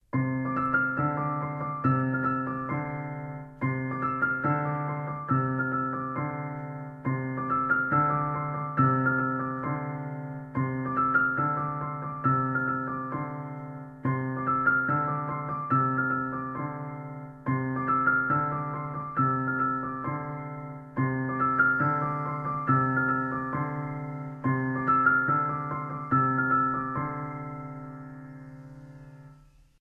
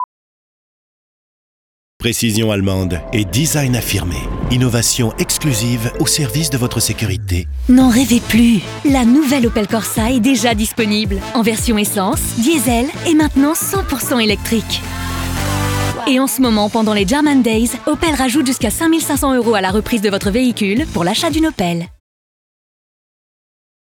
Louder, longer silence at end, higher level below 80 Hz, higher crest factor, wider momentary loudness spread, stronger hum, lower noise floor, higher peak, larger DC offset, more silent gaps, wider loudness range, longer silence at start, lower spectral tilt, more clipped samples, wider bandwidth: second, -28 LUFS vs -15 LUFS; second, 0.45 s vs 2.05 s; second, -60 dBFS vs -30 dBFS; about the same, 18 dB vs 16 dB; first, 14 LU vs 7 LU; neither; second, -55 dBFS vs under -90 dBFS; second, -10 dBFS vs 0 dBFS; neither; second, none vs 0.04-2.00 s; about the same, 3 LU vs 4 LU; first, 0.15 s vs 0 s; first, -11 dB/octave vs -4.5 dB/octave; neither; second, 3.3 kHz vs over 20 kHz